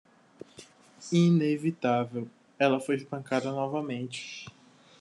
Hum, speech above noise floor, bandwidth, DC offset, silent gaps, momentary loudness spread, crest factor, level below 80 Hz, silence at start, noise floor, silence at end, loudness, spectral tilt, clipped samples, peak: none; 26 dB; 11 kHz; under 0.1%; none; 23 LU; 20 dB; -76 dBFS; 0.6 s; -54 dBFS; 0.5 s; -29 LUFS; -6.5 dB/octave; under 0.1%; -10 dBFS